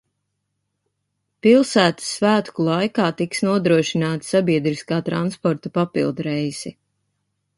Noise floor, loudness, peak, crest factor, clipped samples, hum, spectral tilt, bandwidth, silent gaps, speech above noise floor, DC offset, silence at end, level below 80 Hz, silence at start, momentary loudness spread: -75 dBFS; -20 LUFS; -2 dBFS; 18 dB; under 0.1%; none; -5.5 dB/octave; 11.5 kHz; none; 56 dB; under 0.1%; 0.85 s; -62 dBFS; 1.45 s; 8 LU